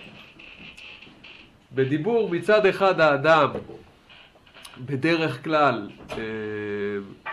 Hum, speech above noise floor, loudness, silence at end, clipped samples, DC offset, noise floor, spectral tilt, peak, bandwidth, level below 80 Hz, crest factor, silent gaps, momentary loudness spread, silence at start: none; 29 dB; -23 LUFS; 0 s; under 0.1%; under 0.1%; -51 dBFS; -6.5 dB/octave; -6 dBFS; 12 kHz; -60 dBFS; 18 dB; none; 25 LU; 0 s